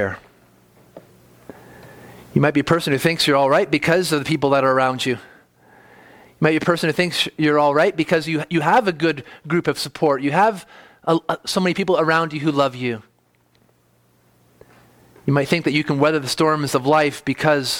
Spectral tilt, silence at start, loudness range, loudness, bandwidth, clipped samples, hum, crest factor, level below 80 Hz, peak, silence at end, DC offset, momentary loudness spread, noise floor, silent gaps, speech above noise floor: -5 dB/octave; 0 s; 5 LU; -19 LUFS; 18.5 kHz; under 0.1%; none; 18 dB; -58 dBFS; -2 dBFS; 0 s; under 0.1%; 7 LU; -60 dBFS; none; 42 dB